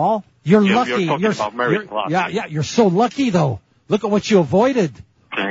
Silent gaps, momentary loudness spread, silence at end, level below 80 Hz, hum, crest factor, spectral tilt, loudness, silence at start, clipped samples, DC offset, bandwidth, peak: none; 8 LU; 0 s; -56 dBFS; none; 16 dB; -6 dB/octave; -18 LUFS; 0 s; under 0.1%; under 0.1%; 8 kHz; -2 dBFS